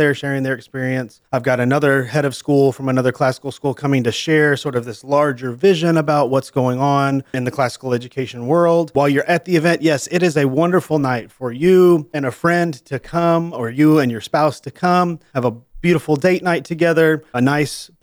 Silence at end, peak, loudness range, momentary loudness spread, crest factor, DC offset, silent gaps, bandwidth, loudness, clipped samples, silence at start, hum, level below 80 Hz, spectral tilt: 0.15 s; -4 dBFS; 2 LU; 9 LU; 14 dB; under 0.1%; none; over 20 kHz; -17 LUFS; under 0.1%; 0 s; none; -54 dBFS; -6.5 dB/octave